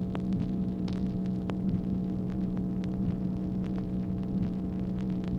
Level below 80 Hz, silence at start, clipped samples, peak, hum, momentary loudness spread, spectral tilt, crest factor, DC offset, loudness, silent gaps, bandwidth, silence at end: -44 dBFS; 0 s; under 0.1%; -14 dBFS; none; 2 LU; -10 dB/octave; 16 dB; under 0.1%; -32 LUFS; none; 6 kHz; 0 s